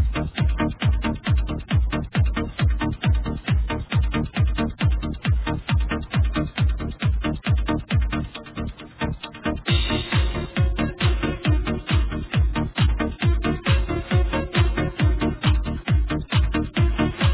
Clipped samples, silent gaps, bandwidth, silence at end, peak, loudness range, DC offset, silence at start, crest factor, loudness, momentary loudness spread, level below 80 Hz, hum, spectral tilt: under 0.1%; none; 4 kHz; 0 s; -8 dBFS; 3 LU; under 0.1%; 0 s; 14 dB; -24 LUFS; 4 LU; -26 dBFS; none; -10.5 dB/octave